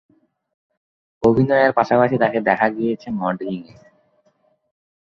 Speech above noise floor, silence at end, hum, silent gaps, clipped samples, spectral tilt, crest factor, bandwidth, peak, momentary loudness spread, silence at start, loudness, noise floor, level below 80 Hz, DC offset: 45 dB; 1.4 s; none; none; under 0.1%; -8.5 dB/octave; 18 dB; 7 kHz; -2 dBFS; 10 LU; 1.2 s; -18 LUFS; -63 dBFS; -54 dBFS; under 0.1%